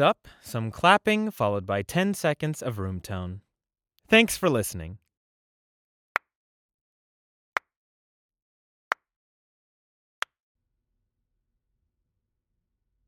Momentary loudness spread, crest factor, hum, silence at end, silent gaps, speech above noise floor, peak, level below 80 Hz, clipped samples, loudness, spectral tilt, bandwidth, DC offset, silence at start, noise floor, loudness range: 17 LU; 26 dB; none; 6.9 s; 5.17-6.15 s; 63 dB; -2 dBFS; -60 dBFS; under 0.1%; -26 LUFS; -4.5 dB/octave; 20 kHz; under 0.1%; 0 s; -88 dBFS; 19 LU